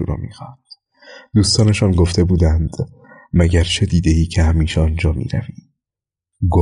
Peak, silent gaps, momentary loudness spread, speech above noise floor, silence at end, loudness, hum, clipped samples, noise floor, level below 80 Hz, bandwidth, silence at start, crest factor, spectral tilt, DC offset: -4 dBFS; none; 14 LU; 72 dB; 0 s; -16 LUFS; none; under 0.1%; -87 dBFS; -24 dBFS; 11 kHz; 0 s; 14 dB; -6 dB/octave; under 0.1%